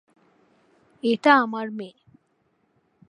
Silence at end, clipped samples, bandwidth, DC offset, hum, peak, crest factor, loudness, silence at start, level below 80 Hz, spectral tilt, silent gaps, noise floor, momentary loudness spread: 1.2 s; under 0.1%; 10.5 kHz; under 0.1%; none; -2 dBFS; 24 dB; -21 LUFS; 1.05 s; -80 dBFS; -5.5 dB/octave; none; -69 dBFS; 19 LU